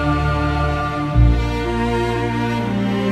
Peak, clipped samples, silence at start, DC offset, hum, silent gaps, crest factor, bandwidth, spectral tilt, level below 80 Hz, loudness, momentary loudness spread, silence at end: -2 dBFS; under 0.1%; 0 s; under 0.1%; none; none; 16 dB; 11.5 kHz; -7.5 dB/octave; -22 dBFS; -19 LUFS; 4 LU; 0 s